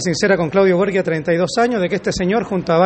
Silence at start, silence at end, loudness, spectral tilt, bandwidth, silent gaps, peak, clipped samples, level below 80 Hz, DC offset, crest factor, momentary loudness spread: 0 s; 0 s; -17 LUFS; -5.5 dB/octave; 8.8 kHz; none; -2 dBFS; under 0.1%; -44 dBFS; under 0.1%; 14 dB; 5 LU